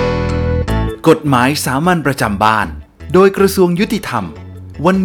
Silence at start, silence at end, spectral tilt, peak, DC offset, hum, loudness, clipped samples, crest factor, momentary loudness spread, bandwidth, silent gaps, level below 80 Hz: 0 s; 0 s; -6 dB/octave; 0 dBFS; under 0.1%; none; -14 LUFS; under 0.1%; 14 dB; 11 LU; over 20 kHz; none; -28 dBFS